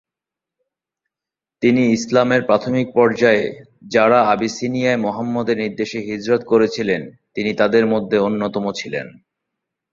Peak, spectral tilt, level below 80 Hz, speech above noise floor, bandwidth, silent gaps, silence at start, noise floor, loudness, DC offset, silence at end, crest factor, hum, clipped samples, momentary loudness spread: -2 dBFS; -5.5 dB/octave; -58 dBFS; 70 dB; 7.6 kHz; none; 1.6 s; -87 dBFS; -18 LUFS; under 0.1%; 0.85 s; 16 dB; none; under 0.1%; 10 LU